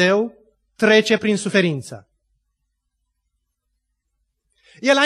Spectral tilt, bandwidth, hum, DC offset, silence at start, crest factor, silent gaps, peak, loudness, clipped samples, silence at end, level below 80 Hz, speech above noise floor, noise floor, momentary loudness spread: -4.5 dB/octave; 12.5 kHz; none; under 0.1%; 0 s; 20 dB; none; -2 dBFS; -18 LUFS; under 0.1%; 0 s; -66 dBFS; 57 dB; -74 dBFS; 14 LU